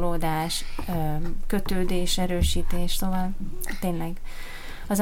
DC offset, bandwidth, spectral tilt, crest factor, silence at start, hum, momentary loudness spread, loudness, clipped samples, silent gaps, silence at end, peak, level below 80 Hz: under 0.1%; 16 kHz; -4.5 dB/octave; 14 dB; 0 s; none; 11 LU; -28 LUFS; under 0.1%; none; 0 s; -10 dBFS; -28 dBFS